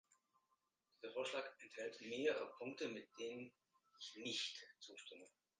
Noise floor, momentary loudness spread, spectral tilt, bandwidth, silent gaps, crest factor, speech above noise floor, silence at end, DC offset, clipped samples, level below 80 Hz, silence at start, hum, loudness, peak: -86 dBFS; 15 LU; -2.5 dB/octave; 9.6 kHz; none; 22 dB; 38 dB; 0.3 s; under 0.1%; under 0.1%; under -90 dBFS; 1 s; none; -48 LUFS; -28 dBFS